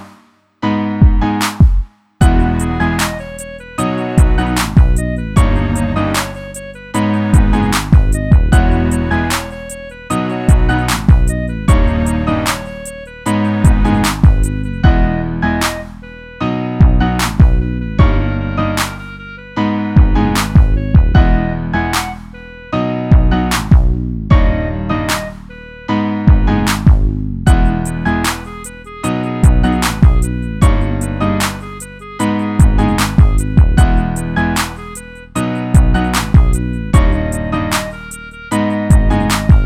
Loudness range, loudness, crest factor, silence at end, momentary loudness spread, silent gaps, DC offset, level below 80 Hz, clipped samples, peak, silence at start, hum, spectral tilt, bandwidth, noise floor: 1 LU; -14 LUFS; 12 dB; 0 s; 14 LU; none; under 0.1%; -16 dBFS; under 0.1%; 0 dBFS; 0 s; none; -6 dB/octave; 16 kHz; -48 dBFS